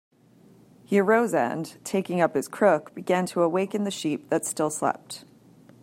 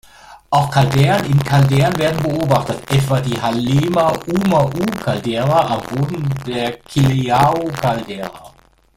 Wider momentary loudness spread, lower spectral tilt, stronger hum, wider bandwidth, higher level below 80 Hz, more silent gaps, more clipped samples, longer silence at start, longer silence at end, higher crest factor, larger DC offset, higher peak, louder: about the same, 8 LU vs 8 LU; second, -5 dB/octave vs -6.5 dB/octave; neither; about the same, 16 kHz vs 16 kHz; second, -74 dBFS vs -42 dBFS; neither; neither; first, 0.9 s vs 0.25 s; about the same, 0.6 s vs 0.5 s; about the same, 20 dB vs 16 dB; neither; second, -6 dBFS vs 0 dBFS; second, -25 LUFS vs -16 LUFS